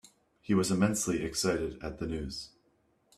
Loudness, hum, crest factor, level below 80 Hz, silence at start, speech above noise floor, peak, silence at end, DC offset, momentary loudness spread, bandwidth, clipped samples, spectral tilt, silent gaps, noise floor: -31 LUFS; none; 18 dB; -52 dBFS; 0.5 s; 40 dB; -14 dBFS; 0.7 s; under 0.1%; 14 LU; 15 kHz; under 0.1%; -4.5 dB/octave; none; -71 dBFS